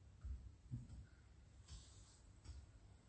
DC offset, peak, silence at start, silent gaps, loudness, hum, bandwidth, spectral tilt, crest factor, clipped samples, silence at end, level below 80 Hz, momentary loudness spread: under 0.1%; -38 dBFS; 0 s; none; -59 LUFS; none; 8.4 kHz; -5.5 dB/octave; 20 dB; under 0.1%; 0 s; -60 dBFS; 11 LU